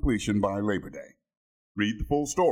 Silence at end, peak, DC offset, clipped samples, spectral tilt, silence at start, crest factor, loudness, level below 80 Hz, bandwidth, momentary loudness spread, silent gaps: 0 s; -12 dBFS; under 0.1%; under 0.1%; -5.5 dB/octave; 0.05 s; 16 dB; -28 LUFS; -40 dBFS; 16 kHz; 16 LU; 1.37-1.75 s